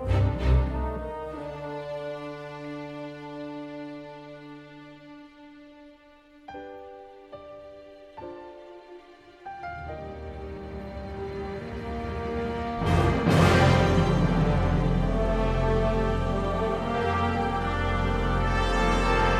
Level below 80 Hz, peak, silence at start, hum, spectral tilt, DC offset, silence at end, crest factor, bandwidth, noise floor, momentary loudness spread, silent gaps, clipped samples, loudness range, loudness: -34 dBFS; -6 dBFS; 0 s; none; -7 dB/octave; under 0.1%; 0 s; 20 dB; 12.5 kHz; -54 dBFS; 22 LU; none; under 0.1%; 21 LU; -27 LUFS